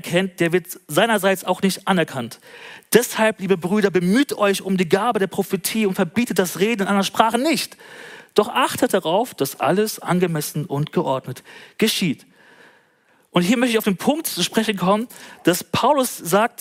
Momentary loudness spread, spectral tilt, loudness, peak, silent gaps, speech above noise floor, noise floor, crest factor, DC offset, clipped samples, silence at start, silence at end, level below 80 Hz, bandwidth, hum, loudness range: 7 LU; -4.5 dB/octave; -20 LUFS; 0 dBFS; none; 39 dB; -59 dBFS; 20 dB; under 0.1%; under 0.1%; 0.05 s; 0.15 s; -64 dBFS; 16.5 kHz; none; 3 LU